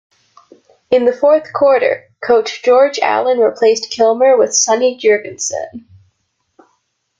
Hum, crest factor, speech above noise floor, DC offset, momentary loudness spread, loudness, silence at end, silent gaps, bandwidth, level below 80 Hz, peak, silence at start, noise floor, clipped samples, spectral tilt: none; 14 dB; 53 dB; under 0.1%; 9 LU; -13 LUFS; 1.4 s; none; 9.2 kHz; -60 dBFS; -2 dBFS; 0.9 s; -66 dBFS; under 0.1%; -1.5 dB/octave